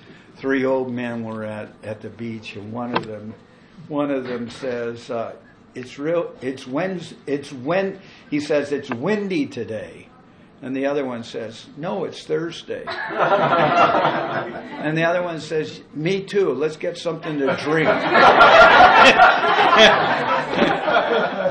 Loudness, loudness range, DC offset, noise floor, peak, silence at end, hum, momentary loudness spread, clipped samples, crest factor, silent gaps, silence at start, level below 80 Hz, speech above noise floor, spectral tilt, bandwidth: -18 LUFS; 16 LU; under 0.1%; -48 dBFS; -2 dBFS; 0 s; none; 20 LU; under 0.1%; 16 dB; none; 0.1 s; -52 dBFS; 29 dB; -4.5 dB/octave; 11 kHz